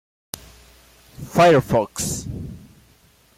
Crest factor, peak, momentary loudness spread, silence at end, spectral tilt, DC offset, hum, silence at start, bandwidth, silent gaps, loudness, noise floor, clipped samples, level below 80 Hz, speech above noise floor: 18 dB; -4 dBFS; 22 LU; 0.8 s; -5 dB/octave; under 0.1%; none; 1.2 s; 16.5 kHz; none; -18 LUFS; -55 dBFS; under 0.1%; -46 dBFS; 38 dB